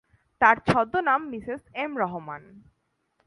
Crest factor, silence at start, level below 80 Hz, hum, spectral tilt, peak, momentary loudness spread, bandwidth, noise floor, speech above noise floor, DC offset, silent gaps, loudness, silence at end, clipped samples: 24 dB; 0.4 s; -58 dBFS; none; -6.5 dB/octave; -4 dBFS; 16 LU; 11.5 kHz; -74 dBFS; 49 dB; under 0.1%; none; -24 LUFS; 0.7 s; under 0.1%